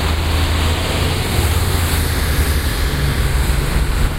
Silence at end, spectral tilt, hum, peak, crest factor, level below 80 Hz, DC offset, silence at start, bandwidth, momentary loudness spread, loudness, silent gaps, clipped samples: 0 s; -4.5 dB/octave; none; -2 dBFS; 14 dB; -18 dBFS; under 0.1%; 0 s; 16 kHz; 2 LU; -17 LUFS; none; under 0.1%